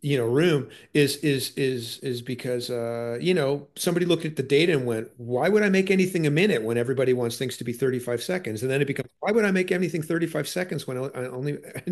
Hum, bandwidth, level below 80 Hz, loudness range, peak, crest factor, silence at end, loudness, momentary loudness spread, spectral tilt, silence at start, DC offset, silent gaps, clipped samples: none; 12.5 kHz; -66 dBFS; 3 LU; -8 dBFS; 16 dB; 0 s; -25 LUFS; 10 LU; -5.5 dB/octave; 0 s; under 0.1%; none; under 0.1%